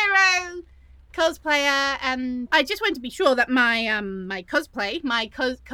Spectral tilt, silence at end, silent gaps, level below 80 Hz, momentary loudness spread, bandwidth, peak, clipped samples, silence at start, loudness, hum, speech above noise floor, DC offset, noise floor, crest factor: -2.5 dB/octave; 0 s; none; -52 dBFS; 9 LU; 19 kHz; -2 dBFS; under 0.1%; 0 s; -22 LUFS; none; 26 dB; under 0.1%; -50 dBFS; 20 dB